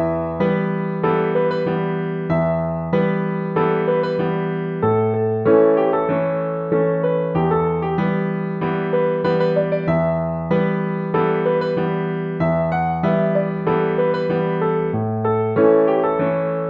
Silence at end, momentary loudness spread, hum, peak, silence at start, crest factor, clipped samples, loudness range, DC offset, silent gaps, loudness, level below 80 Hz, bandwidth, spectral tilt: 0 s; 6 LU; none; -2 dBFS; 0 s; 16 dB; under 0.1%; 2 LU; under 0.1%; none; -19 LUFS; -48 dBFS; 5 kHz; -10 dB/octave